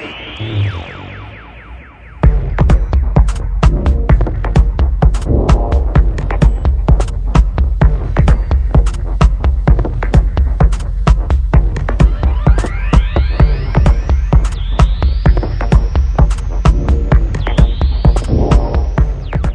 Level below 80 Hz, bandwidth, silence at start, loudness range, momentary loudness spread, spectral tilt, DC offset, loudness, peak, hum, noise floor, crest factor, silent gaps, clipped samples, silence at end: -12 dBFS; 9.2 kHz; 0 s; 1 LU; 5 LU; -7.5 dB/octave; under 0.1%; -14 LUFS; 0 dBFS; none; -33 dBFS; 12 dB; none; under 0.1%; 0 s